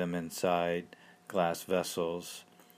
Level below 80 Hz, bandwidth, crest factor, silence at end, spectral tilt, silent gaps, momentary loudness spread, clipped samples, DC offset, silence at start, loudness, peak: -72 dBFS; 15.5 kHz; 18 dB; 0.35 s; -4.5 dB/octave; none; 16 LU; under 0.1%; under 0.1%; 0 s; -33 LUFS; -16 dBFS